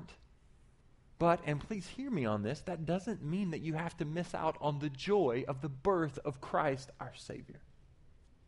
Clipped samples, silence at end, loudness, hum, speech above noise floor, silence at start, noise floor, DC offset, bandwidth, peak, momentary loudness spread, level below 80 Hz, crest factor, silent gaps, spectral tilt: under 0.1%; 0.35 s; -36 LUFS; none; 27 dB; 0 s; -63 dBFS; under 0.1%; 11.5 kHz; -16 dBFS; 15 LU; -60 dBFS; 20 dB; none; -7 dB/octave